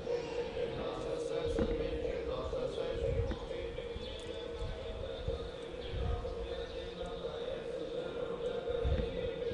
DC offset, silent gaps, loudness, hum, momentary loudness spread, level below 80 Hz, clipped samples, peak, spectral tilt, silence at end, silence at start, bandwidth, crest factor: under 0.1%; none; -39 LUFS; none; 7 LU; -46 dBFS; under 0.1%; -22 dBFS; -6.5 dB/octave; 0 s; 0 s; 11 kHz; 16 dB